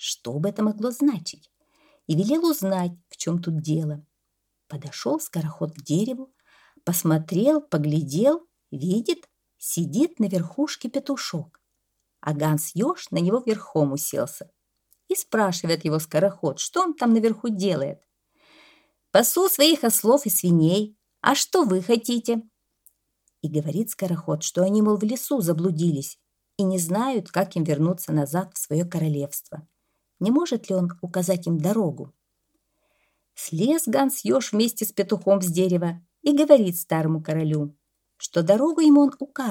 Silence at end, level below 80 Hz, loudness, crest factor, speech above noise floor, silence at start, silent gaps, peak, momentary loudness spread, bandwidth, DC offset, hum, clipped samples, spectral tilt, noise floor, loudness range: 0 s; -72 dBFS; -23 LUFS; 22 dB; 54 dB; 0 s; none; -2 dBFS; 12 LU; 18 kHz; under 0.1%; none; under 0.1%; -5.5 dB/octave; -77 dBFS; 6 LU